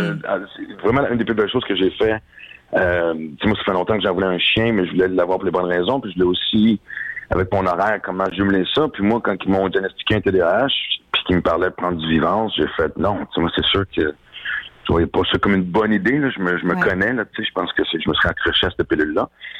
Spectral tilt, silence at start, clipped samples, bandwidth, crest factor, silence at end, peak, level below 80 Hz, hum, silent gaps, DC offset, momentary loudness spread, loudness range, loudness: -7.5 dB/octave; 0 s; under 0.1%; 8.4 kHz; 12 dB; 0 s; -6 dBFS; -42 dBFS; none; none; under 0.1%; 6 LU; 2 LU; -19 LUFS